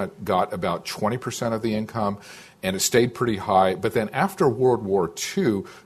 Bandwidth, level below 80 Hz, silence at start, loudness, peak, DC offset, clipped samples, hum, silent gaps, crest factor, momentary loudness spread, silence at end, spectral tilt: 14 kHz; -54 dBFS; 0 s; -23 LUFS; -4 dBFS; under 0.1%; under 0.1%; none; none; 18 dB; 7 LU; 0.05 s; -4.5 dB/octave